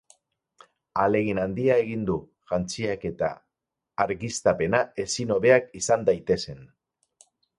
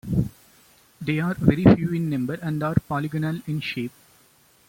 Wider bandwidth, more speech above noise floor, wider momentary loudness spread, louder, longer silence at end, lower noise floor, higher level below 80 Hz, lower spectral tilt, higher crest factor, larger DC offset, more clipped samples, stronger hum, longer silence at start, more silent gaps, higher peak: second, 11.5 kHz vs 16.5 kHz; first, 61 dB vs 36 dB; second, 10 LU vs 13 LU; about the same, -25 LUFS vs -23 LUFS; about the same, 0.9 s vs 0.8 s; first, -85 dBFS vs -58 dBFS; second, -54 dBFS vs -44 dBFS; second, -5 dB/octave vs -8 dB/octave; about the same, 20 dB vs 22 dB; neither; neither; neither; first, 0.95 s vs 0.05 s; neither; second, -6 dBFS vs -2 dBFS